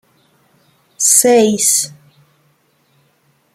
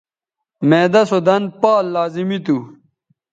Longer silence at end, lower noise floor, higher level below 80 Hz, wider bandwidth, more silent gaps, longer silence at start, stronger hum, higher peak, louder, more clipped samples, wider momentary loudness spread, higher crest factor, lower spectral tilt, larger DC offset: first, 1.65 s vs 0.65 s; second, -58 dBFS vs -82 dBFS; about the same, -64 dBFS vs -66 dBFS; first, 16.5 kHz vs 9 kHz; neither; first, 1 s vs 0.6 s; neither; about the same, 0 dBFS vs 0 dBFS; first, -11 LUFS vs -16 LUFS; neither; about the same, 7 LU vs 9 LU; about the same, 18 dB vs 16 dB; second, -2 dB/octave vs -7 dB/octave; neither